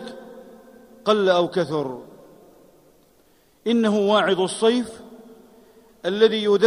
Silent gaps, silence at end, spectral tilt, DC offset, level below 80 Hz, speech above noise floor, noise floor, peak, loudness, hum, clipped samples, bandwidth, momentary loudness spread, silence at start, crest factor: none; 0 s; -5 dB/octave; under 0.1%; -66 dBFS; 38 dB; -58 dBFS; -4 dBFS; -21 LUFS; none; under 0.1%; 11.5 kHz; 20 LU; 0 s; 20 dB